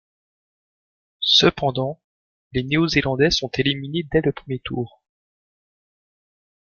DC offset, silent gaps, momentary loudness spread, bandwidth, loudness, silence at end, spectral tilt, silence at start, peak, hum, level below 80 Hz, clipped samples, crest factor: under 0.1%; 2.04-2.51 s; 15 LU; 7.2 kHz; -20 LUFS; 1.75 s; -5 dB/octave; 1.2 s; -2 dBFS; none; -46 dBFS; under 0.1%; 22 dB